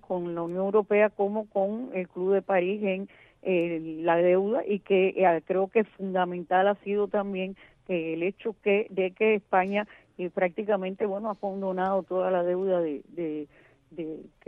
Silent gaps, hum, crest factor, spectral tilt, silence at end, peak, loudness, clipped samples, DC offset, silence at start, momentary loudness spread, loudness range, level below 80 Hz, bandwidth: none; none; 18 dB; -9 dB/octave; 0.2 s; -10 dBFS; -27 LUFS; under 0.1%; under 0.1%; 0.1 s; 11 LU; 3 LU; -68 dBFS; 3.9 kHz